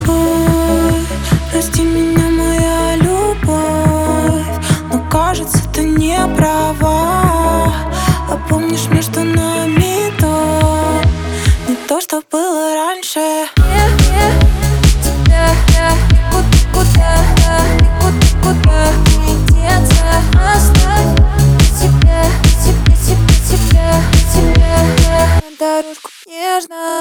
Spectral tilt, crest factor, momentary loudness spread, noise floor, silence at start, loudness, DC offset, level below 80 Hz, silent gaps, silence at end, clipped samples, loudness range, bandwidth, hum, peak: -5.5 dB/octave; 10 dB; 6 LU; -31 dBFS; 0 s; -12 LUFS; under 0.1%; -14 dBFS; none; 0 s; under 0.1%; 4 LU; over 20 kHz; none; 0 dBFS